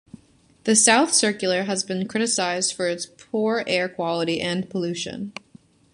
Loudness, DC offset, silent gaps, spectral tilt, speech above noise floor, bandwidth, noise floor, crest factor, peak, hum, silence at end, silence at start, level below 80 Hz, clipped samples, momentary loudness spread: -22 LUFS; under 0.1%; none; -2.5 dB/octave; 34 dB; 11.5 kHz; -57 dBFS; 22 dB; -2 dBFS; none; 0.6 s; 0.65 s; -64 dBFS; under 0.1%; 15 LU